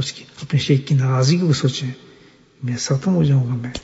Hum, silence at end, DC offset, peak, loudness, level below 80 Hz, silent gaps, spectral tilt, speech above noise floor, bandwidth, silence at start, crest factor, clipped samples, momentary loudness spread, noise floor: none; 0.05 s; under 0.1%; -4 dBFS; -19 LUFS; -50 dBFS; none; -6 dB/octave; 31 dB; 8 kHz; 0 s; 16 dB; under 0.1%; 13 LU; -49 dBFS